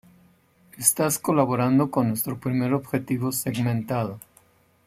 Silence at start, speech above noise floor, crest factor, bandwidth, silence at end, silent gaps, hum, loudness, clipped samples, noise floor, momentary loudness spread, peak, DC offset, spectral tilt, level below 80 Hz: 0.75 s; 36 dB; 22 dB; 16 kHz; 0.65 s; none; none; -24 LUFS; under 0.1%; -59 dBFS; 7 LU; -2 dBFS; under 0.1%; -5.5 dB/octave; -62 dBFS